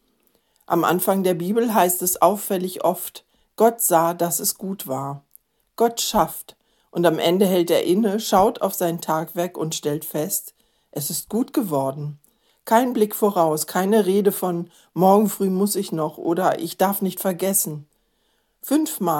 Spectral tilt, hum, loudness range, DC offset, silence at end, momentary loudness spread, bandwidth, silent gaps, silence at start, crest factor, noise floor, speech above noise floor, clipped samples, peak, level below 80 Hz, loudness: -4.5 dB/octave; none; 4 LU; under 0.1%; 0 s; 11 LU; 17.5 kHz; none; 0.7 s; 20 dB; -67 dBFS; 47 dB; under 0.1%; 0 dBFS; -58 dBFS; -21 LUFS